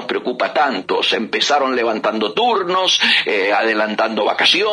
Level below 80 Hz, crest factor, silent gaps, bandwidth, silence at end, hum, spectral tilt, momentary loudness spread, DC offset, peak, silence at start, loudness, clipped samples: -70 dBFS; 16 dB; none; 10.5 kHz; 0 s; none; -2 dB/octave; 5 LU; under 0.1%; -2 dBFS; 0 s; -16 LUFS; under 0.1%